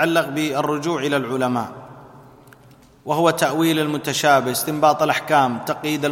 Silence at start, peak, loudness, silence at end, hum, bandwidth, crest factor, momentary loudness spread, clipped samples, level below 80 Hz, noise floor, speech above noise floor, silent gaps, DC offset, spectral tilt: 0 s; -2 dBFS; -19 LUFS; 0 s; none; 16.5 kHz; 18 dB; 8 LU; under 0.1%; -60 dBFS; -49 dBFS; 30 dB; none; under 0.1%; -4.5 dB/octave